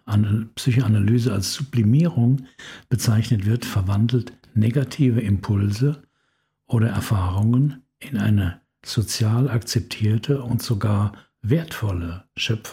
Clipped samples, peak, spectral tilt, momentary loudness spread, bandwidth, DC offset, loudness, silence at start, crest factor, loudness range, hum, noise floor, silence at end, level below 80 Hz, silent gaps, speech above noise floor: under 0.1%; -6 dBFS; -6.5 dB/octave; 8 LU; 16 kHz; under 0.1%; -22 LUFS; 0.05 s; 16 dB; 2 LU; none; -70 dBFS; 0 s; -48 dBFS; none; 50 dB